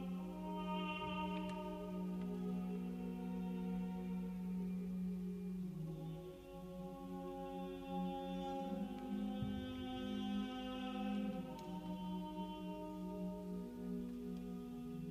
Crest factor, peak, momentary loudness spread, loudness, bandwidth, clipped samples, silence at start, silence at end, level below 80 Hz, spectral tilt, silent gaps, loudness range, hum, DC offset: 14 dB; -30 dBFS; 6 LU; -45 LUFS; 15.5 kHz; under 0.1%; 0 s; 0 s; -64 dBFS; -7.5 dB/octave; none; 3 LU; none; under 0.1%